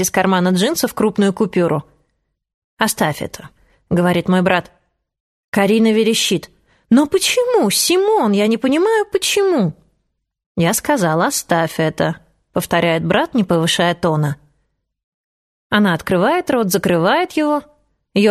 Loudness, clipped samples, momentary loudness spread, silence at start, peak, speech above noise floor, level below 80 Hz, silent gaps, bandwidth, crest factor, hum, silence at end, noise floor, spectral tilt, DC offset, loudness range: -16 LUFS; under 0.1%; 8 LU; 0 s; 0 dBFS; 55 dB; -52 dBFS; 2.54-2.77 s, 5.20-5.52 s, 10.46-10.55 s, 15.03-15.70 s; 15 kHz; 16 dB; none; 0 s; -71 dBFS; -4.5 dB/octave; under 0.1%; 5 LU